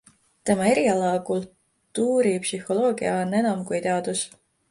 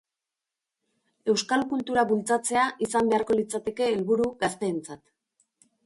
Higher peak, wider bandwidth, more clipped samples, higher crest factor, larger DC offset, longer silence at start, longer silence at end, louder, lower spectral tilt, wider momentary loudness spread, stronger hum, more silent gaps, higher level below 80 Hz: about the same, -8 dBFS vs -10 dBFS; about the same, 11.5 kHz vs 11.5 kHz; neither; about the same, 16 dB vs 16 dB; neither; second, 0.45 s vs 1.25 s; second, 0.45 s vs 0.9 s; about the same, -24 LUFS vs -26 LUFS; about the same, -5 dB/octave vs -4 dB/octave; about the same, 9 LU vs 7 LU; neither; neither; about the same, -64 dBFS vs -64 dBFS